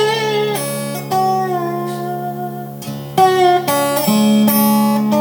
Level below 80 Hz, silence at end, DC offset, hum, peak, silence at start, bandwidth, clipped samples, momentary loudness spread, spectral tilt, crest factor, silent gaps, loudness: -60 dBFS; 0 s; under 0.1%; none; 0 dBFS; 0 s; over 20 kHz; under 0.1%; 12 LU; -5 dB/octave; 14 dB; none; -15 LUFS